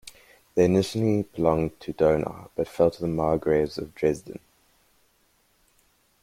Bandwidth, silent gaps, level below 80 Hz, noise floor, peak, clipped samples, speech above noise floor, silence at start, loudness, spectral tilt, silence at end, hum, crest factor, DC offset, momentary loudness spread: 15.5 kHz; none; -52 dBFS; -66 dBFS; -6 dBFS; under 0.1%; 42 dB; 0.05 s; -25 LUFS; -7 dB/octave; 1.85 s; none; 20 dB; under 0.1%; 11 LU